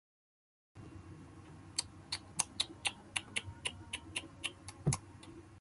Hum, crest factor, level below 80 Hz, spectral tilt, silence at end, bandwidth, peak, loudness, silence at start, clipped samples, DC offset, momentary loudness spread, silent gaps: none; 32 dB; -60 dBFS; -2.5 dB/octave; 0 s; 12 kHz; -12 dBFS; -40 LUFS; 0.75 s; under 0.1%; under 0.1%; 18 LU; none